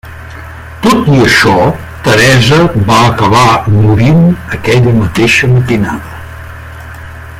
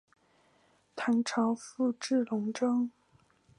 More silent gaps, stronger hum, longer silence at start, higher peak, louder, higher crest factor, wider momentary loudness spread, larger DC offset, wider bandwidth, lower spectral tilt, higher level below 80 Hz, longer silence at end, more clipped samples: neither; neither; second, 0.05 s vs 0.95 s; first, 0 dBFS vs -16 dBFS; first, -7 LUFS vs -31 LUFS; second, 8 dB vs 16 dB; first, 21 LU vs 7 LU; neither; first, 16 kHz vs 11 kHz; about the same, -5.5 dB/octave vs -4.5 dB/octave; first, -30 dBFS vs -82 dBFS; second, 0 s vs 0.7 s; first, 0.2% vs under 0.1%